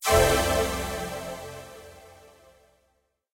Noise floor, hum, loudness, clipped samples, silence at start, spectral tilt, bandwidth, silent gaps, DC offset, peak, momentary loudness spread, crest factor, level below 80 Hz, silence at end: -72 dBFS; none; -25 LUFS; under 0.1%; 0 s; -3.5 dB/octave; 16.5 kHz; none; under 0.1%; -6 dBFS; 25 LU; 22 dB; -40 dBFS; 1.25 s